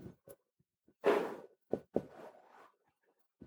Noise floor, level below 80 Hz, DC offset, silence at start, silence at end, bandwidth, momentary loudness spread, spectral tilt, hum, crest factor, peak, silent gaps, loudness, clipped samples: -82 dBFS; -76 dBFS; under 0.1%; 0 s; 0 s; over 20 kHz; 23 LU; -6 dB/octave; none; 26 dB; -16 dBFS; none; -37 LUFS; under 0.1%